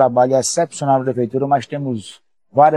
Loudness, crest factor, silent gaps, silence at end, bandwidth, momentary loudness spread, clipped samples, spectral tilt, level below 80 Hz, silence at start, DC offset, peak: -18 LUFS; 16 dB; none; 0 s; 13 kHz; 11 LU; under 0.1%; -5 dB/octave; -66 dBFS; 0 s; 0.1%; 0 dBFS